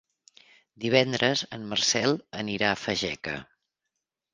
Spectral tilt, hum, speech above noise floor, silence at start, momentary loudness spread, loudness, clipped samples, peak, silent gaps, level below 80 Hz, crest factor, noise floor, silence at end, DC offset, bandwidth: -3 dB/octave; none; 57 dB; 0.8 s; 11 LU; -26 LUFS; under 0.1%; -4 dBFS; none; -62 dBFS; 26 dB; -84 dBFS; 0.9 s; under 0.1%; 10.5 kHz